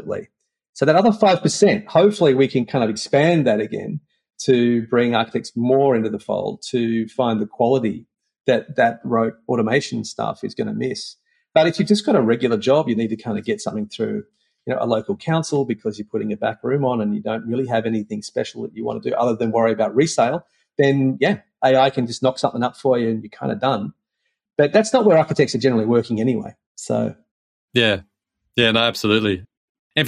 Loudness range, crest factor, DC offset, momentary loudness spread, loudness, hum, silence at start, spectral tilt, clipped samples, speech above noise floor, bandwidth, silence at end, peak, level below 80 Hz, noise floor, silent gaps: 5 LU; 18 dB; under 0.1%; 11 LU; -19 LUFS; none; 0 s; -5.5 dB/octave; under 0.1%; 56 dB; 13 kHz; 0 s; -2 dBFS; -64 dBFS; -75 dBFS; 0.69-0.73 s, 26.66-26.75 s, 27.31-27.68 s, 29.57-29.90 s